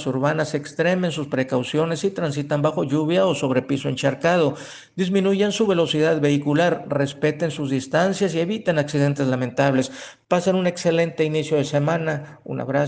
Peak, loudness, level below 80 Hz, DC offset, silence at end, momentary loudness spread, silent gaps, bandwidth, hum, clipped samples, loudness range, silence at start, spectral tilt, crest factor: -4 dBFS; -21 LUFS; -62 dBFS; under 0.1%; 0 s; 6 LU; none; 9.6 kHz; none; under 0.1%; 2 LU; 0 s; -6 dB/octave; 18 dB